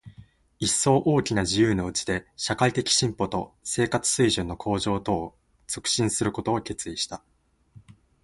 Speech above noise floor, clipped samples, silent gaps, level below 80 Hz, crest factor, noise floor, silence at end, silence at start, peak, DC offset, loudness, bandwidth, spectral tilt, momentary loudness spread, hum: 29 dB; under 0.1%; none; -50 dBFS; 20 dB; -54 dBFS; 1.05 s; 0.05 s; -6 dBFS; under 0.1%; -25 LUFS; 11.5 kHz; -4 dB/octave; 9 LU; none